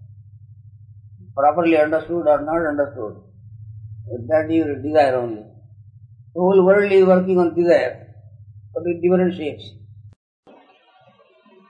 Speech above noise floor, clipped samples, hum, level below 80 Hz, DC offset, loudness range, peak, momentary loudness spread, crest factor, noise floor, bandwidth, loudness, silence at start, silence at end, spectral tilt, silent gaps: 36 dB; under 0.1%; none; -58 dBFS; under 0.1%; 7 LU; -2 dBFS; 21 LU; 18 dB; -54 dBFS; 9.2 kHz; -18 LUFS; 0.15 s; 1.6 s; -8.5 dB/octave; none